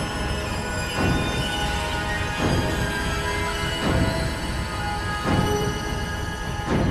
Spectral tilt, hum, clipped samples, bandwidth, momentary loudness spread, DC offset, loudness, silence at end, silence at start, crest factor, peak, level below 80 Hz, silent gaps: -5 dB/octave; none; under 0.1%; 14 kHz; 5 LU; under 0.1%; -25 LUFS; 0 s; 0 s; 16 dB; -8 dBFS; -32 dBFS; none